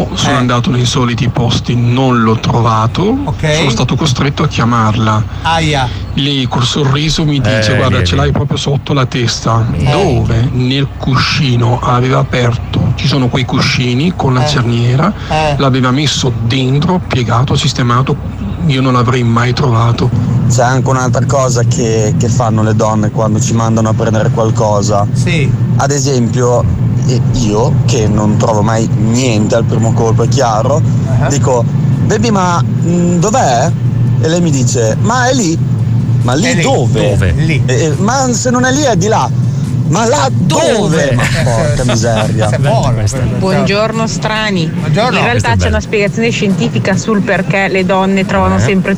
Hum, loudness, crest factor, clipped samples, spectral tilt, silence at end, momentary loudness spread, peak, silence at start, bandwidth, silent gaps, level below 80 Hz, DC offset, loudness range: none; -11 LUFS; 10 dB; under 0.1%; -5.5 dB/octave; 0 s; 3 LU; 0 dBFS; 0 s; over 20 kHz; none; -28 dBFS; under 0.1%; 1 LU